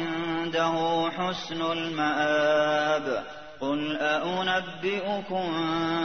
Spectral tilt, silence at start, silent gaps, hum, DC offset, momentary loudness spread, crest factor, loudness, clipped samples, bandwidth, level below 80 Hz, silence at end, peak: -5 dB/octave; 0 s; none; none; 0.3%; 7 LU; 16 dB; -27 LUFS; under 0.1%; 6.6 kHz; -64 dBFS; 0 s; -12 dBFS